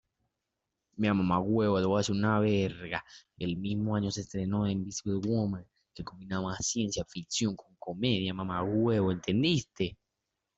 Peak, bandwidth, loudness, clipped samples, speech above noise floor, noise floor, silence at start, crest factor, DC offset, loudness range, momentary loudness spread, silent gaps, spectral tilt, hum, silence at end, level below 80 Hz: -14 dBFS; 8.2 kHz; -31 LUFS; under 0.1%; 55 dB; -86 dBFS; 0.95 s; 18 dB; under 0.1%; 4 LU; 10 LU; none; -5.5 dB/octave; none; 0.65 s; -60 dBFS